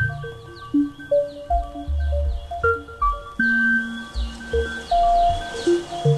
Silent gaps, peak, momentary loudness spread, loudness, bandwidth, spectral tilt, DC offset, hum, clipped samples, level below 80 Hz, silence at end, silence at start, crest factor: none; -8 dBFS; 11 LU; -22 LUFS; 12.5 kHz; -6.5 dB/octave; under 0.1%; none; under 0.1%; -30 dBFS; 0 s; 0 s; 14 dB